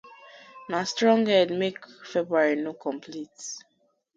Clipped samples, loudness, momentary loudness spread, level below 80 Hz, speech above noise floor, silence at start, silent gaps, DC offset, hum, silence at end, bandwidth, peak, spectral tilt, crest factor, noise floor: under 0.1%; -25 LUFS; 18 LU; -74 dBFS; 24 dB; 0.05 s; none; under 0.1%; none; 0.55 s; 9 kHz; -8 dBFS; -4 dB/octave; 20 dB; -49 dBFS